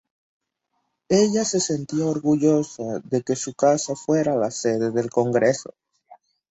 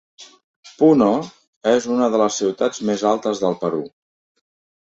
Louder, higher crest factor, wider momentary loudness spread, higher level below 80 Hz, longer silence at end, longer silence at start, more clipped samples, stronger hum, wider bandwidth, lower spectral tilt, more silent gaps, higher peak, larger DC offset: second, -22 LUFS vs -19 LUFS; about the same, 18 dB vs 18 dB; second, 7 LU vs 10 LU; about the same, -62 dBFS vs -62 dBFS; second, 0.35 s vs 1 s; first, 1.1 s vs 0.2 s; neither; neither; about the same, 8.2 kHz vs 8 kHz; about the same, -5 dB/octave vs -5 dB/octave; second, none vs 0.44-0.63 s, 1.47-1.61 s; second, -6 dBFS vs -2 dBFS; neither